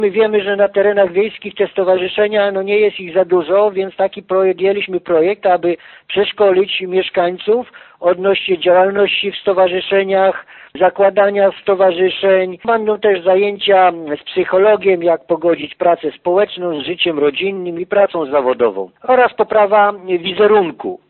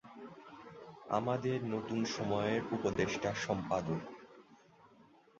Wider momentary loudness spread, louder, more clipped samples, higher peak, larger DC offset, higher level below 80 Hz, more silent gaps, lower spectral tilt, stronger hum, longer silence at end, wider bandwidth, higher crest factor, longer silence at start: second, 7 LU vs 18 LU; first, -14 LUFS vs -36 LUFS; neither; first, 0 dBFS vs -18 dBFS; neither; first, -58 dBFS vs -64 dBFS; neither; second, -2.5 dB/octave vs -5 dB/octave; neither; second, 0.15 s vs 0.55 s; second, 4.3 kHz vs 7.8 kHz; second, 14 dB vs 20 dB; about the same, 0 s vs 0.05 s